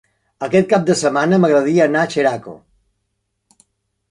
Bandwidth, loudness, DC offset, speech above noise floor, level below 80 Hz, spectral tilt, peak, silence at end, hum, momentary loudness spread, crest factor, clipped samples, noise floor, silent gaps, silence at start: 11.5 kHz; -15 LUFS; under 0.1%; 57 dB; -60 dBFS; -5.5 dB/octave; -2 dBFS; 1.55 s; none; 6 LU; 16 dB; under 0.1%; -72 dBFS; none; 0.4 s